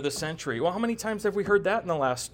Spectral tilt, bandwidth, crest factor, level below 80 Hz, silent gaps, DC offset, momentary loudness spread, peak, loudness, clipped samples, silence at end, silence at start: -4.5 dB/octave; 17.5 kHz; 16 dB; -56 dBFS; none; under 0.1%; 6 LU; -12 dBFS; -27 LUFS; under 0.1%; 0.05 s; 0 s